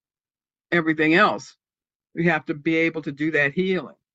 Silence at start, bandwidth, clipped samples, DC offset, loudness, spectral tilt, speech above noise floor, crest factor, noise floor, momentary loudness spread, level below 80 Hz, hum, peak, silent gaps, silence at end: 0.7 s; 7.8 kHz; under 0.1%; under 0.1%; -21 LUFS; -6.5 dB/octave; over 68 dB; 20 dB; under -90 dBFS; 10 LU; -66 dBFS; none; -4 dBFS; none; 0.25 s